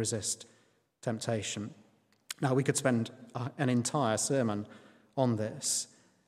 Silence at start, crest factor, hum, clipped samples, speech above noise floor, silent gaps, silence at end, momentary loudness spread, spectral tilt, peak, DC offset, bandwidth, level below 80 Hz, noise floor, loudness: 0 s; 20 dB; none; under 0.1%; 37 dB; none; 0.45 s; 11 LU; -4.5 dB/octave; -12 dBFS; under 0.1%; 16 kHz; -76 dBFS; -69 dBFS; -32 LUFS